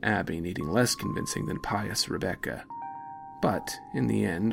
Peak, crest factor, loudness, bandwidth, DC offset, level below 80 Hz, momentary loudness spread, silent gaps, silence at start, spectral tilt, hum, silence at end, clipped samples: -12 dBFS; 18 dB; -30 LUFS; 16.5 kHz; under 0.1%; -52 dBFS; 13 LU; none; 0 s; -4.5 dB/octave; none; 0 s; under 0.1%